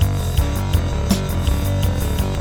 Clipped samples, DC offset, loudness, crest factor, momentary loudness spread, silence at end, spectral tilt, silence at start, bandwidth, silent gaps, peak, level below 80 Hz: under 0.1%; under 0.1%; -20 LUFS; 14 dB; 1 LU; 0 s; -6 dB/octave; 0 s; 18 kHz; none; -4 dBFS; -24 dBFS